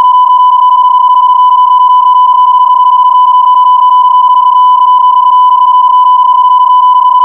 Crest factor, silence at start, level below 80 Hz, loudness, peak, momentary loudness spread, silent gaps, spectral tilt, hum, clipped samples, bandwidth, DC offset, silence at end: 4 dB; 0 s; -64 dBFS; -4 LUFS; 0 dBFS; 1 LU; none; -3.5 dB/octave; none; under 0.1%; 3.2 kHz; 0.4%; 0 s